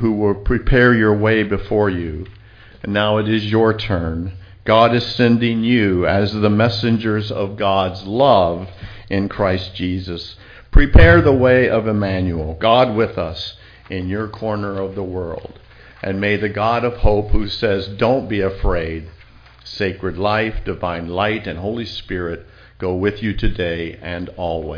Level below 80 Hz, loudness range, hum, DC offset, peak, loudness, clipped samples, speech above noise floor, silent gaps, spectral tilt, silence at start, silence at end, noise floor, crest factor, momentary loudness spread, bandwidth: -26 dBFS; 8 LU; none; under 0.1%; 0 dBFS; -18 LUFS; under 0.1%; 28 dB; none; -8 dB/octave; 0 s; 0 s; -44 dBFS; 16 dB; 14 LU; 5.2 kHz